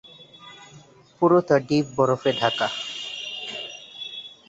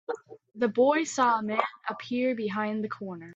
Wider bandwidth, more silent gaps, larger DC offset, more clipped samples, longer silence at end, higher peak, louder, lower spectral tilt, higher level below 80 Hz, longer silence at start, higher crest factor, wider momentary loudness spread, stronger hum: about the same, 8 kHz vs 8.4 kHz; neither; neither; neither; first, 0.2 s vs 0 s; first, -4 dBFS vs -8 dBFS; first, -23 LUFS vs -28 LUFS; about the same, -5.5 dB/octave vs -4.5 dB/octave; first, -64 dBFS vs -76 dBFS; about the same, 0.05 s vs 0.1 s; about the same, 20 dB vs 20 dB; first, 20 LU vs 13 LU; neither